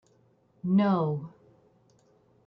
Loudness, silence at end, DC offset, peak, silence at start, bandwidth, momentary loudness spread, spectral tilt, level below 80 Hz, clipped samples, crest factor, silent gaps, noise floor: -27 LUFS; 1.2 s; under 0.1%; -14 dBFS; 0.65 s; 5.6 kHz; 15 LU; -10 dB/octave; -72 dBFS; under 0.1%; 16 dB; none; -65 dBFS